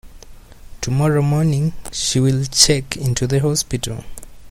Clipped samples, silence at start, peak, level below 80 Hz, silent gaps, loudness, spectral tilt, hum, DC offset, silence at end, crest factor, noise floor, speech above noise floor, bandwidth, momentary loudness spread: under 0.1%; 0.05 s; 0 dBFS; -38 dBFS; none; -17 LUFS; -4.5 dB/octave; none; under 0.1%; 0 s; 18 dB; -39 dBFS; 21 dB; 16 kHz; 11 LU